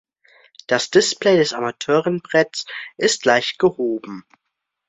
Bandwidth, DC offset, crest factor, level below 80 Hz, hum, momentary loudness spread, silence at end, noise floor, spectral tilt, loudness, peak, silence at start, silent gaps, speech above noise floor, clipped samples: 8.4 kHz; under 0.1%; 18 dB; -64 dBFS; none; 12 LU; 0.7 s; -78 dBFS; -3.5 dB/octave; -19 LUFS; -2 dBFS; 0.7 s; none; 60 dB; under 0.1%